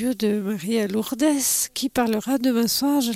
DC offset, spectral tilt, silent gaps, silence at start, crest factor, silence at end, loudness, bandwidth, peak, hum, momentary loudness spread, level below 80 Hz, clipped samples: under 0.1%; -3.5 dB/octave; none; 0 s; 14 dB; 0 s; -22 LUFS; 16.5 kHz; -8 dBFS; none; 4 LU; -58 dBFS; under 0.1%